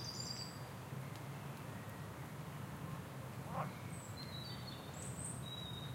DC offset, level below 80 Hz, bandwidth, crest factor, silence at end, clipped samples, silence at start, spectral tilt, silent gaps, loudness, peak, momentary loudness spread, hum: under 0.1%; -66 dBFS; 16 kHz; 18 dB; 0 s; under 0.1%; 0 s; -4.5 dB/octave; none; -47 LUFS; -28 dBFS; 5 LU; none